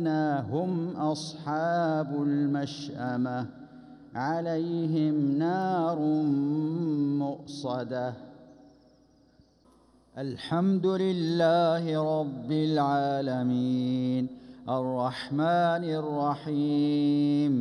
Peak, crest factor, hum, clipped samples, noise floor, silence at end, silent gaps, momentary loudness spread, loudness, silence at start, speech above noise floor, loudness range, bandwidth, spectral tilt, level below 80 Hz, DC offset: -14 dBFS; 14 dB; none; under 0.1%; -61 dBFS; 0 s; none; 9 LU; -28 LUFS; 0 s; 34 dB; 6 LU; 10.5 kHz; -7.5 dB/octave; -70 dBFS; under 0.1%